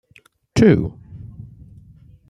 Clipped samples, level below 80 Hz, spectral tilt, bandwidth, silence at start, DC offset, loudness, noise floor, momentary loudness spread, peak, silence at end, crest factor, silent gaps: under 0.1%; -44 dBFS; -7.5 dB/octave; 11.5 kHz; 0.55 s; under 0.1%; -17 LUFS; -54 dBFS; 25 LU; -2 dBFS; 0.9 s; 20 dB; none